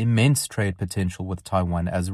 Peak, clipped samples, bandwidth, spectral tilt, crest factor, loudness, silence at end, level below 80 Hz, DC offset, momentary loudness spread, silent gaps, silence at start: -6 dBFS; under 0.1%; 14.5 kHz; -5.5 dB/octave; 16 dB; -24 LUFS; 0 s; -48 dBFS; under 0.1%; 8 LU; none; 0 s